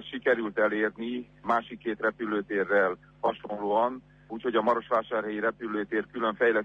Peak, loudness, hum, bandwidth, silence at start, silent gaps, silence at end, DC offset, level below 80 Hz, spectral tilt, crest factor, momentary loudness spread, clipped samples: -12 dBFS; -29 LUFS; 50 Hz at -60 dBFS; 7 kHz; 0 s; none; 0 s; under 0.1%; -66 dBFS; -7 dB/octave; 16 dB; 9 LU; under 0.1%